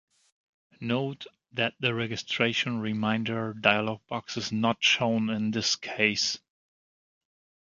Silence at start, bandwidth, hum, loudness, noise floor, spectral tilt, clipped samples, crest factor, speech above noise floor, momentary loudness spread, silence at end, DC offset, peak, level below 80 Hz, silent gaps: 0.8 s; 7.6 kHz; none; -27 LUFS; under -90 dBFS; -4 dB/octave; under 0.1%; 26 dB; over 62 dB; 11 LU; 1.3 s; under 0.1%; -4 dBFS; -68 dBFS; none